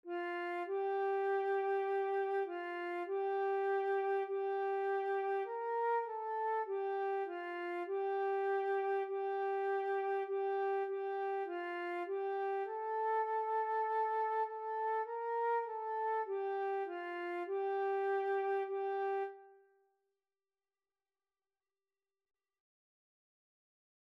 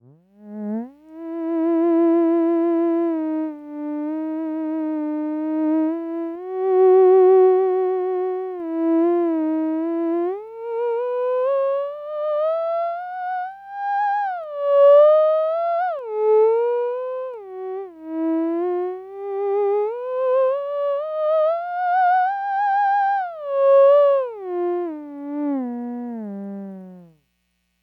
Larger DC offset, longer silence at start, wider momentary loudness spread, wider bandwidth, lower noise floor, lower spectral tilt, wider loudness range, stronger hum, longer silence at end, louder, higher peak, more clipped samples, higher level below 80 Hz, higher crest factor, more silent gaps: neither; second, 0.05 s vs 0.4 s; second, 5 LU vs 16 LU; first, 5.4 kHz vs 4.7 kHz; first, under -90 dBFS vs -70 dBFS; second, -3.5 dB/octave vs -8.5 dB/octave; second, 2 LU vs 7 LU; second, none vs 60 Hz at -70 dBFS; first, 4.6 s vs 0.8 s; second, -37 LUFS vs -20 LUFS; second, -26 dBFS vs -6 dBFS; neither; second, under -90 dBFS vs -74 dBFS; about the same, 12 dB vs 14 dB; neither